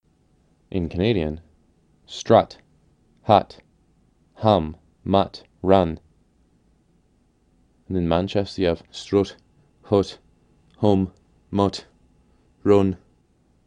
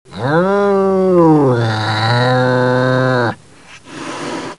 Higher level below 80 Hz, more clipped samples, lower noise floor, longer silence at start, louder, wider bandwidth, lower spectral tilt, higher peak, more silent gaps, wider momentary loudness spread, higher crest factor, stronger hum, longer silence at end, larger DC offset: first, -48 dBFS vs -54 dBFS; neither; first, -62 dBFS vs -41 dBFS; first, 0.75 s vs 0.1 s; second, -22 LUFS vs -13 LUFS; second, 10 kHz vs 11.5 kHz; about the same, -7 dB/octave vs -7 dB/octave; about the same, 0 dBFS vs 0 dBFS; neither; about the same, 16 LU vs 14 LU; first, 24 dB vs 14 dB; neither; first, 0.7 s vs 0.05 s; second, under 0.1% vs 0.4%